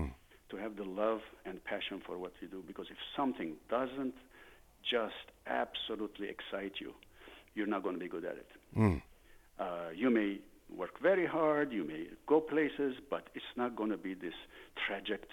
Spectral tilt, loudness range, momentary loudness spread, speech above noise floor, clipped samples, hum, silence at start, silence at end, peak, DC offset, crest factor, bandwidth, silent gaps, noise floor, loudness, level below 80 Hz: -7 dB/octave; 6 LU; 16 LU; 24 dB; under 0.1%; none; 0 s; 0 s; -16 dBFS; under 0.1%; 22 dB; 18 kHz; none; -61 dBFS; -37 LUFS; -60 dBFS